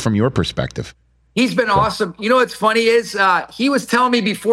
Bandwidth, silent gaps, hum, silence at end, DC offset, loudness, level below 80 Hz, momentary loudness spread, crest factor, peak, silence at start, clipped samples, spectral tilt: 15.5 kHz; none; none; 0 s; under 0.1%; -17 LUFS; -44 dBFS; 9 LU; 14 dB; -2 dBFS; 0 s; under 0.1%; -5 dB/octave